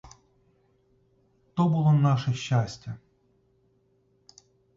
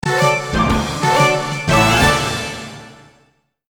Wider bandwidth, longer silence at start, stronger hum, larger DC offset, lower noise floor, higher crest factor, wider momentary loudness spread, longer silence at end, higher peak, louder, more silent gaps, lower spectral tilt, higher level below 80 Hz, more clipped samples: second, 7.6 kHz vs over 20 kHz; first, 1.55 s vs 0.05 s; neither; neither; first, -67 dBFS vs -59 dBFS; about the same, 16 dB vs 16 dB; first, 19 LU vs 12 LU; first, 1.8 s vs 0.8 s; second, -12 dBFS vs 0 dBFS; second, -25 LUFS vs -15 LUFS; neither; first, -7.5 dB/octave vs -4 dB/octave; second, -62 dBFS vs -32 dBFS; neither